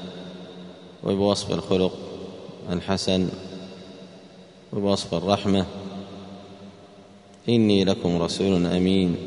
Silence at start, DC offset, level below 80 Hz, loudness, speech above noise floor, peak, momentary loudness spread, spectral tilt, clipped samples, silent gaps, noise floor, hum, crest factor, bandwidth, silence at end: 0 s; under 0.1%; -54 dBFS; -23 LUFS; 26 dB; -4 dBFS; 21 LU; -6 dB/octave; under 0.1%; none; -48 dBFS; none; 22 dB; 10.5 kHz; 0 s